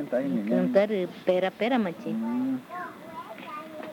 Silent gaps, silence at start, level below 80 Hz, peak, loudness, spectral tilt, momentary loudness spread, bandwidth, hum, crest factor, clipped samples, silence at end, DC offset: none; 0 s; -76 dBFS; -8 dBFS; -27 LUFS; -7.5 dB/octave; 15 LU; 18.5 kHz; none; 20 dB; under 0.1%; 0 s; under 0.1%